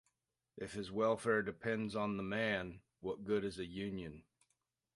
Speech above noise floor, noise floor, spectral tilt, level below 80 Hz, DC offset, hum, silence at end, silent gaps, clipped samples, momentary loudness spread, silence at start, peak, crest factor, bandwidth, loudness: 48 dB; -86 dBFS; -6 dB/octave; -68 dBFS; under 0.1%; none; 0.75 s; none; under 0.1%; 12 LU; 0.55 s; -22 dBFS; 18 dB; 11.5 kHz; -39 LUFS